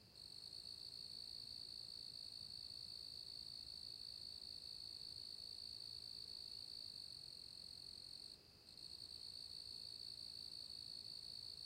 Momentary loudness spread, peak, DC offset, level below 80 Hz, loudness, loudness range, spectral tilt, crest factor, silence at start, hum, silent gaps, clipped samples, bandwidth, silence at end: 3 LU; -42 dBFS; under 0.1%; -78 dBFS; -51 LUFS; 2 LU; -1.5 dB/octave; 12 dB; 0 s; none; none; under 0.1%; 16 kHz; 0 s